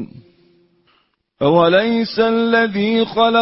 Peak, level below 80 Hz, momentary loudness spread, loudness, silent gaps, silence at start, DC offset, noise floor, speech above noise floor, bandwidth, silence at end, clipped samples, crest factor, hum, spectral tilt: -2 dBFS; -56 dBFS; 5 LU; -15 LUFS; none; 0 s; under 0.1%; -62 dBFS; 47 dB; 5.8 kHz; 0 s; under 0.1%; 16 dB; none; -9.5 dB/octave